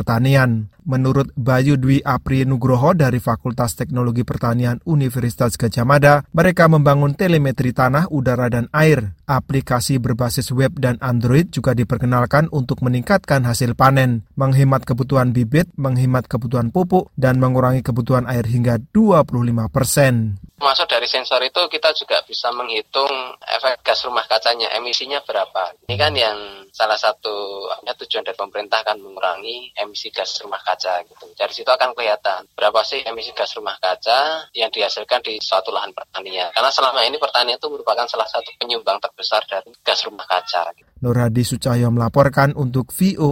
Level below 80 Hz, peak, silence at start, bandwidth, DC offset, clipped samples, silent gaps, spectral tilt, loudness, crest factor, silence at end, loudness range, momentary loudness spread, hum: -44 dBFS; 0 dBFS; 0 s; 16.5 kHz; under 0.1%; under 0.1%; none; -5.5 dB/octave; -18 LUFS; 18 dB; 0 s; 5 LU; 9 LU; none